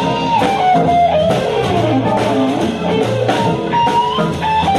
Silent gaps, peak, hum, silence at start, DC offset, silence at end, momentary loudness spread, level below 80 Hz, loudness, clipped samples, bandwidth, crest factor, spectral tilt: none; -2 dBFS; none; 0 s; under 0.1%; 0 s; 4 LU; -40 dBFS; -14 LUFS; under 0.1%; 13 kHz; 10 dB; -6 dB/octave